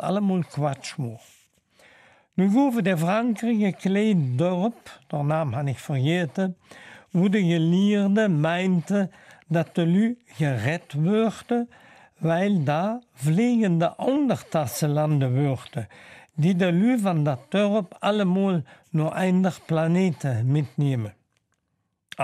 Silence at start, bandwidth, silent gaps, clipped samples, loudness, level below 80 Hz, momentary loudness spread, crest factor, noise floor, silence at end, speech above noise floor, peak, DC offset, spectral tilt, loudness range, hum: 0 s; 14.5 kHz; none; under 0.1%; -24 LUFS; -68 dBFS; 9 LU; 14 dB; -75 dBFS; 0 s; 52 dB; -8 dBFS; under 0.1%; -7.5 dB/octave; 2 LU; none